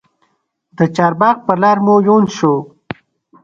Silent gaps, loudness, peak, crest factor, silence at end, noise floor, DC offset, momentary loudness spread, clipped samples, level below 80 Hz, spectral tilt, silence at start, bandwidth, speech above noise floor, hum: none; -13 LUFS; 0 dBFS; 14 dB; 0.75 s; -63 dBFS; under 0.1%; 20 LU; under 0.1%; -56 dBFS; -7 dB/octave; 0.8 s; 7.4 kHz; 51 dB; none